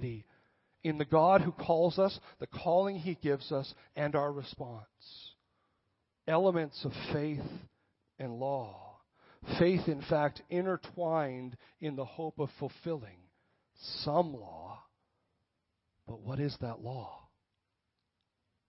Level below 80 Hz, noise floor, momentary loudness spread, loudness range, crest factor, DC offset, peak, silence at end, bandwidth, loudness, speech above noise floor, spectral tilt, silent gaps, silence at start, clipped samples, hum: -66 dBFS; -84 dBFS; 20 LU; 9 LU; 22 dB; under 0.1%; -12 dBFS; 1.5 s; 5.8 kHz; -33 LUFS; 51 dB; -10 dB/octave; none; 0 s; under 0.1%; none